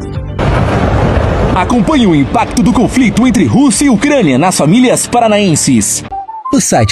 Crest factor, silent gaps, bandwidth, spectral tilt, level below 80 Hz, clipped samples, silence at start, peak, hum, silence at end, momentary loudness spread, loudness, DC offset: 10 dB; none; 13.5 kHz; -5 dB/octave; -24 dBFS; under 0.1%; 0 s; 0 dBFS; none; 0 s; 5 LU; -9 LUFS; under 0.1%